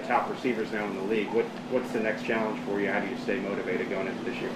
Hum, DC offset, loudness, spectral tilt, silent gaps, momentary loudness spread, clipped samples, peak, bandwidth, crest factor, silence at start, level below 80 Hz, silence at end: none; under 0.1%; -30 LUFS; -6 dB/octave; none; 4 LU; under 0.1%; -10 dBFS; 14.5 kHz; 18 dB; 0 s; -64 dBFS; 0 s